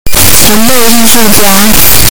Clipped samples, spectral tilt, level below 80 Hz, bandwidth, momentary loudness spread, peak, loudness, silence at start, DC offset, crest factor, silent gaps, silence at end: 50%; -2.5 dB/octave; -20 dBFS; over 20 kHz; 2 LU; 0 dBFS; -3 LUFS; 0.05 s; 60%; 8 dB; none; 0 s